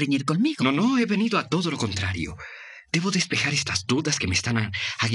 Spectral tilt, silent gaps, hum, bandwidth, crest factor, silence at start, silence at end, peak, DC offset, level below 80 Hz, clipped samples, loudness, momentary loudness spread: -4 dB/octave; none; none; 11.5 kHz; 18 dB; 0 s; 0 s; -6 dBFS; under 0.1%; -56 dBFS; under 0.1%; -24 LUFS; 7 LU